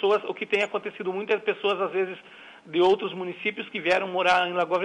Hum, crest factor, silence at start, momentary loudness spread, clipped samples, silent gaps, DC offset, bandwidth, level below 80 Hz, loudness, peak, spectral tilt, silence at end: none; 14 dB; 0 s; 9 LU; under 0.1%; none; under 0.1%; 10 kHz; -70 dBFS; -25 LUFS; -12 dBFS; -4.5 dB/octave; 0 s